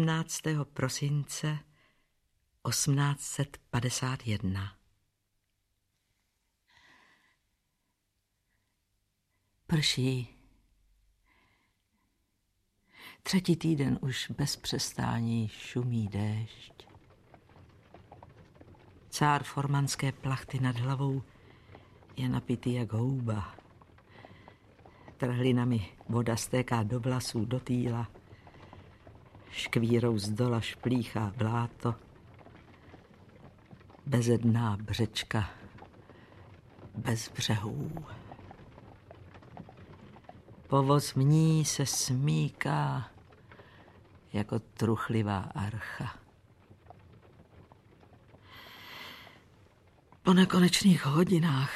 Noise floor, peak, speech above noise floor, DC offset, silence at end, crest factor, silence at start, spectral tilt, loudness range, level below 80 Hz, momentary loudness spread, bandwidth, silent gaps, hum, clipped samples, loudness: -79 dBFS; -10 dBFS; 50 dB; under 0.1%; 0 s; 22 dB; 0 s; -5.5 dB/octave; 10 LU; -60 dBFS; 20 LU; 14.5 kHz; none; none; under 0.1%; -31 LUFS